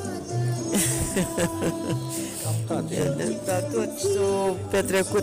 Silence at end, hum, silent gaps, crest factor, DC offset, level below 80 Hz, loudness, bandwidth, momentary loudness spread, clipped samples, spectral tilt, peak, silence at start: 0 s; none; none; 12 dB; under 0.1%; -48 dBFS; -26 LUFS; 16 kHz; 5 LU; under 0.1%; -5 dB/octave; -14 dBFS; 0 s